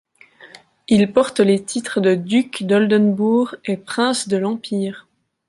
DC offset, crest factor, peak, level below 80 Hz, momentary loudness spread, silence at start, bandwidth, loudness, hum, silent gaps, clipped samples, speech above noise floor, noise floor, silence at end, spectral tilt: under 0.1%; 16 dB; -2 dBFS; -60 dBFS; 8 LU; 0.45 s; 11.5 kHz; -18 LUFS; none; none; under 0.1%; 29 dB; -47 dBFS; 0.5 s; -5.5 dB/octave